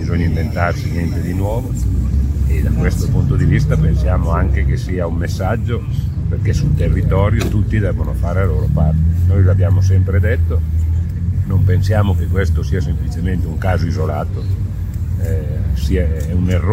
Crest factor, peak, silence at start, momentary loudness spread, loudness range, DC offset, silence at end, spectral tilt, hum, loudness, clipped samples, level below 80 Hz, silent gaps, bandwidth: 14 dB; 0 dBFS; 0 s; 6 LU; 4 LU; under 0.1%; 0 s; -8 dB/octave; none; -17 LUFS; under 0.1%; -20 dBFS; none; 14.5 kHz